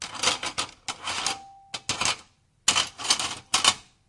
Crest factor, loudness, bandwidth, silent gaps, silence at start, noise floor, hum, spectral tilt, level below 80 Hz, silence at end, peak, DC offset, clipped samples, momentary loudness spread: 28 dB; -25 LUFS; 11.5 kHz; none; 0 s; -55 dBFS; none; 0.5 dB/octave; -60 dBFS; 0.25 s; 0 dBFS; under 0.1%; under 0.1%; 13 LU